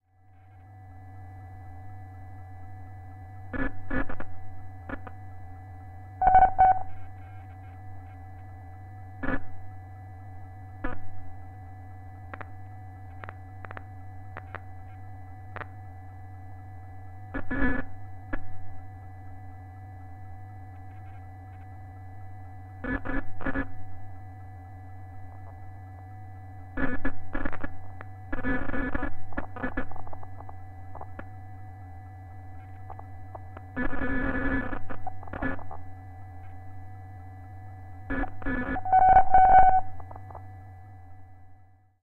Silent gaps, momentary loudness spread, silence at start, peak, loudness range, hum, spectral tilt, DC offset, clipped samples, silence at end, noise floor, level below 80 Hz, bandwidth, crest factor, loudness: none; 17 LU; 0.55 s; -4 dBFS; 21 LU; none; -9 dB/octave; under 0.1%; under 0.1%; 0.45 s; -55 dBFS; -42 dBFS; 3.7 kHz; 24 dB; -27 LUFS